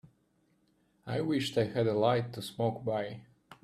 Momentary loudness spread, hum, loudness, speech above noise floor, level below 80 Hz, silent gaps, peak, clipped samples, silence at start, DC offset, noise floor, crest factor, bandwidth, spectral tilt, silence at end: 13 LU; none; -32 LUFS; 41 dB; -68 dBFS; none; -14 dBFS; under 0.1%; 0.05 s; under 0.1%; -72 dBFS; 20 dB; 14 kHz; -6.5 dB/octave; 0.1 s